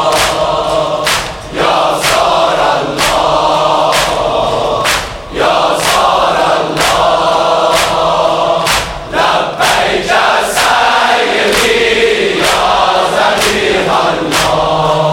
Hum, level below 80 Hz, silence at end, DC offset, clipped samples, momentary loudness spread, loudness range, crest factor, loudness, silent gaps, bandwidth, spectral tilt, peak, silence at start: none; -34 dBFS; 0 s; under 0.1%; under 0.1%; 4 LU; 2 LU; 10 dB; -10 LUFS; none; 18 kHz; -2.5 dB/octave; 0 dBFS; 0 s